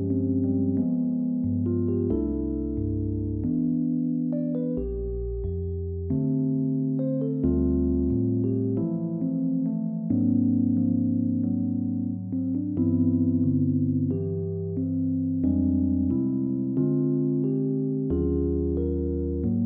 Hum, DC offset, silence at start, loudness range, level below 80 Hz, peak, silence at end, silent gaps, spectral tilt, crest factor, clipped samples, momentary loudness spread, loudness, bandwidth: none; under 0.1%; 0 s; 3 LU; -40 dBFS; -12 dBFS; 0 s; none; -15.5 dB/octave; 12 dB; under 0.1%; 5 LU; -26 LUFS; 1.5 kHz